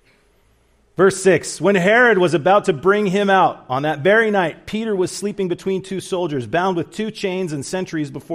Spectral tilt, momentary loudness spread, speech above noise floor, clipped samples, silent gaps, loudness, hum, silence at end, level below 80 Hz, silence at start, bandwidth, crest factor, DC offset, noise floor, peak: -5 dB/octave; 11 LU; 40 dB; under 0.1%; none; -18 LUFS; none; 0 s; -56 dBFS; 1 s; 15 kHz; 16 dB; under 0.1%; -57 dBFS; -2 dBFS